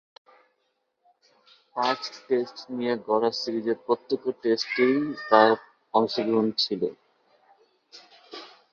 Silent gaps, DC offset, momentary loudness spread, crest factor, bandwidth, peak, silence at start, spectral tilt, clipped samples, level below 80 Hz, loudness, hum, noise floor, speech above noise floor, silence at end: none; under 0.1%; 11 LU; 24 dB; 7.4 kHz; -4 dBFS; 1.75 s; -5 dB/octave; under 0.1%; -74 dBFS; -25 LUFS; none; -75 dBFS; 50 dB; 0.25 s